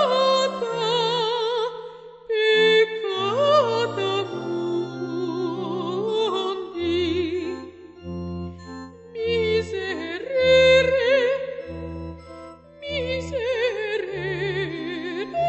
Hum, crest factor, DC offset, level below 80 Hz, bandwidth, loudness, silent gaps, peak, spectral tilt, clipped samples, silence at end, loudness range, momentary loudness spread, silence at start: none; 16 dB; under 0.1%; -50 dBFS; 8.4 kHz; -23 LUFS; none; -6 dBFS; -5 dB/octave; under 0.1%; 0 s; 7 LU; 18 LU; 0 s